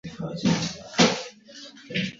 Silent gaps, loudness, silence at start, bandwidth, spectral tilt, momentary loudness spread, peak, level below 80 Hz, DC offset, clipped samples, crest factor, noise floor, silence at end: none; -25 LUFS; 0.05 s; 7.8 kHz; -4 dB/octave; 22 LU; -4 dBFS; -58 dBFS; under 0.1%; under 0.1%; 24 dB; -46 dBFS; 0 s